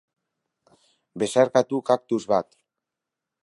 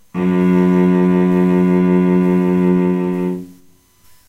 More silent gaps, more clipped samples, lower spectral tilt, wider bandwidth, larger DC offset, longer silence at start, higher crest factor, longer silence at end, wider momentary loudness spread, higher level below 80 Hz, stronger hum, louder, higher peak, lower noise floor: neither; neither; second, -5 dB/octave vs -9.5 dB/octave; first, 11.5 kHz vs 5.8 kHz; neither; first, 1.15 s vs 0.15 s; first, 22 dB vs 10 dB; first, 1 s vs 0.75 s; first, 15 LU vs 6 LU; second, -70 dBFS vs -50 dBFS; neither; second, -23 LUFS vs -14 LUFS; about the same, -4 dBFS vs -4 dBFS; first, -86 dBFS vs -49 dBFS